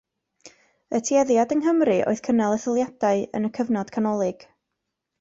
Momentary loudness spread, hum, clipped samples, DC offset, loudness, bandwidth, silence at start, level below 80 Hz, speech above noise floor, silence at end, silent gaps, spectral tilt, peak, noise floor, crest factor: 7 LU; none; under 0.1%; under 0.1%; -23 LUFS; 8 kHz; 0.45 s; -64 dBFS; 59 dB; 0.9 s; none; -5.5 dB/octave; -8 dBFS; -81 dBFS; 14 dB